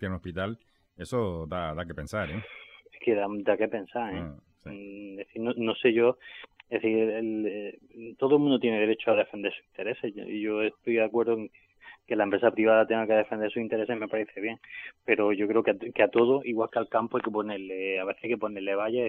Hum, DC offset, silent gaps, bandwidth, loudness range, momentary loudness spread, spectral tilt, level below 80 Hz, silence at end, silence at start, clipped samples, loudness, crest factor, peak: none; under 0.1%; none; 10.5 kHz; 5 LU; 18 LU; -7 dB/octave; -60 dBFS; 0 s; 0 s; under 0.1%; -28 LUFS; 22 dB; -8 dBFS